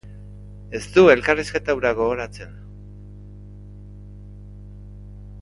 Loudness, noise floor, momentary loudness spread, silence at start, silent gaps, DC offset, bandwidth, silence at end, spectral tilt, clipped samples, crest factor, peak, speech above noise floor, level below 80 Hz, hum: -19 LUFS; -40 dBFS; 27 LU; 0.05 s; none; under 0.1%; 11.5 kHz; 0 s; -5.5 dB/octave; under 0.1%; 22 dB; 0 dBFS; 21 dB; -42 dBFS; 50 Hz at -40 dBFS